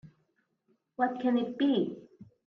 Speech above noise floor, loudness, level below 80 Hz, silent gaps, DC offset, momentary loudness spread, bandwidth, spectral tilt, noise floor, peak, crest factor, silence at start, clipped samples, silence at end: 47 dB; -30 LUFS; -78 dBFS; none; under 0.1%; 16 LU; 5.8 kHz; -8 dB/octave; -75 dBFS; -14 dBFS; 18 dB; 0.05 s; under 0.1%; 0.2 s